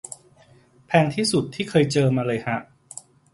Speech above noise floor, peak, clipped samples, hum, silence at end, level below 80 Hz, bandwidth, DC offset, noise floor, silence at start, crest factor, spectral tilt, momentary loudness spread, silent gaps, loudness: 33 dB; -2 dBFS; under 0.1%; none; 0.7 s; -58 dBFS; 11.5 kHz; under 0.1%; -54 dBFS; 0.9 s; 22 dB; -5.5 dB/octave; 21 LU; none; -22 LUFS